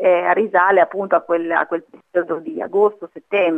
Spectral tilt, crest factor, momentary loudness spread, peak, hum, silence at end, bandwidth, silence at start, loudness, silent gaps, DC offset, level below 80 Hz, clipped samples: -7.5 dB/octave; 16 dB; 10 LU; 0 dBFS; none; 0 s; 3.8 kHz; 0 s; -18 LUFS; none; under 0.1%; -72 dBFS; under 0.1%